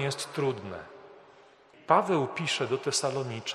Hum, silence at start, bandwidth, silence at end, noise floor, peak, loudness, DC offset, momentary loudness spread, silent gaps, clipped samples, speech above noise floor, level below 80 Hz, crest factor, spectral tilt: none; 0 s; 13 kHz; 0 s; -56 dBFS; -6 dBFS; -29 LUFS; under 0.1%; 16 LU; none; under 0.1%; 27 dB; -72 dBFS; 24 dB; -4 dB/octave